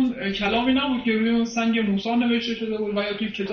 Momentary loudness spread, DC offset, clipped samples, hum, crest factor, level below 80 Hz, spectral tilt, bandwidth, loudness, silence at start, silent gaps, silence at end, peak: 6 LU; under 0.1%; under 0.1%; none; 12 dB; -52 dBFS; -5.5 dB/octave; 6.8 kHz; -23 LUFS; 0 s; none; 0 s; -10 dBFS